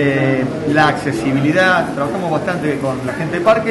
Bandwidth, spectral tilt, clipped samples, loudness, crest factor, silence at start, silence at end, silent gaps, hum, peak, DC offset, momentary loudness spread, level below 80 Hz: 11.5 kHz; -6.5 dB/octave; under 0.1%; -16 LUFS; 12 dB; 0 s; 0 s; none; none; -2 dBFS; under 0.1%; 7 LU; -46 dBFS